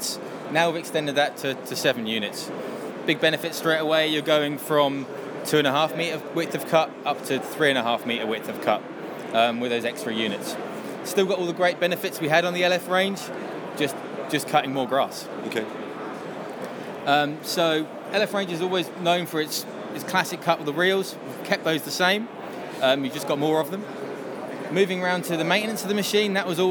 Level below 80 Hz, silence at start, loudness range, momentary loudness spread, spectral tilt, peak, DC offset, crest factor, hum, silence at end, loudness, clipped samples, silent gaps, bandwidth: -78 dBFS; 0 s; 3 LU; 12 LU; -4 dB/octave; -4 dBFS; under 0.1%; 20 dB; none; 0 s; -25 LUFS; under 0.1%; none; over 20 kHz